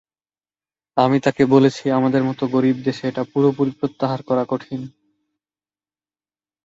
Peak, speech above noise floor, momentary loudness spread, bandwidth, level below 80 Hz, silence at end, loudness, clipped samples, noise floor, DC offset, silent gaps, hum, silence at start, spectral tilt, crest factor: -2 dBFS; over 72 dB; 10 LU; 7.8 kHz; -60 dBFS; 1.75 s; -19 LUFS; under 0.1%; under -90 dBFS; under 0.1%; none; none; 0.95 s; -7.5 dB/octave; 18 dB